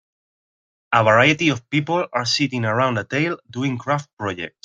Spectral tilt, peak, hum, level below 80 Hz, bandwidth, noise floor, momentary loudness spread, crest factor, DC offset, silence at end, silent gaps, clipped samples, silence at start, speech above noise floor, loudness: -5 dB/octave; -2 dBFS; none; -60 dBFS; 9.4 kHz; under -90 dBFS; 11 LU; 20 dB; under 0.1%; 0.15 s; 4.13-4.17 s; under 0.1%; 0.9 s; over 70 dB; -20 LUFS